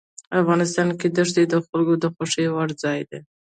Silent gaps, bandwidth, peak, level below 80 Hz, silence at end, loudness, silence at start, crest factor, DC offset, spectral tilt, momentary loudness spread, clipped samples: 1.69-1.73 s; 9.4 kHz; -6 dBFS; -64 dBFS; 0.35 s; -21 LUFS; 0.3 s; 16 dB; under 0.1%; -5.5 dB/octave; 7 LU; under 0.1%